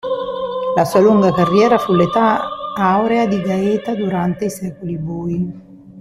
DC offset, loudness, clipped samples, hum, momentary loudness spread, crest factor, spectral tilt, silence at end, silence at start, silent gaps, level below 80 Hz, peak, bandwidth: under 0.1%; -16 LUFS; under 0.1%; none; 11 LU; 14 dB; -7 dB/octave; 0 s; 0.05 s; none; -50 dBFS; -2 dBFS; 14 kHz